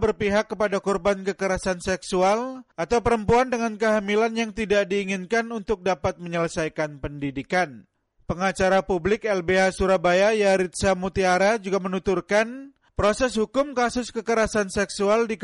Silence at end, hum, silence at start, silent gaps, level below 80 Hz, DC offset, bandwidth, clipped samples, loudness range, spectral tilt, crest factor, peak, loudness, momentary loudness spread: 0 s; none; 0 s; none; -44 dBFS; under 0.1%; 11.5 kHz; under 0.1%; 4 LU; -5 dB/octave; 12 dB; -10 dBFS; -23 LUFS; 7 LU